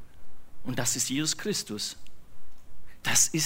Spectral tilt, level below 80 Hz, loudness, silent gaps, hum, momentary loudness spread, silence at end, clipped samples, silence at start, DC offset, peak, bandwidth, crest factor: -2 dB/octave; -56 dBFS; -28 LUFS; none; none; 13 LU; 0 s; under 0.1%; 0 s; under 0.1%; -10 dBFS; 16 kHz; 20 dB